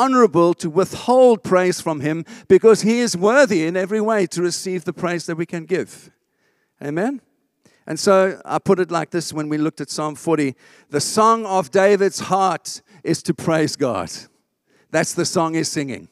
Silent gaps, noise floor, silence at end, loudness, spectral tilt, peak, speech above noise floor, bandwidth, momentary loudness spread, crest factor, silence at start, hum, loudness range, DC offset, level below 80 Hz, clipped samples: none; -66 dBFS; 0.05 s; -19 LUFS; -5 dB/octave; -2 dBFS; 48 dB; 15 kHz; 12 LU; 16 dB; 0 s; none; 7 LU; under 0.1%; -62 dBFS; under 0.1%